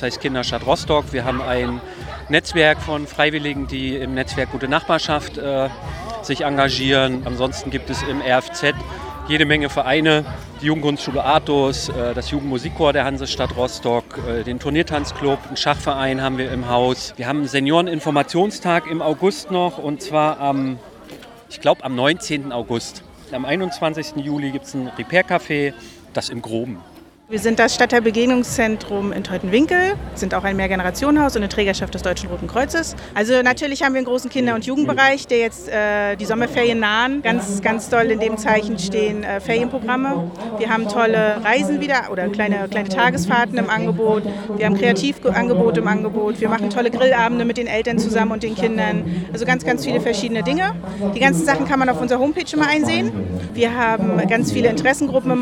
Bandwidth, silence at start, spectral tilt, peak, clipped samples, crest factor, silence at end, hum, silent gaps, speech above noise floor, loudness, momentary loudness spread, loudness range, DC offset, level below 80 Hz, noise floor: 16.5 kHz; 0 s; -5 dB/octave; 0 dBFS; under 0.1%; 20 dB; 0 s; none; none; 21 dB; -19 LUFS; 9 LU; 4 LU; under 0.1%; -40 dBFS; -39 dBFS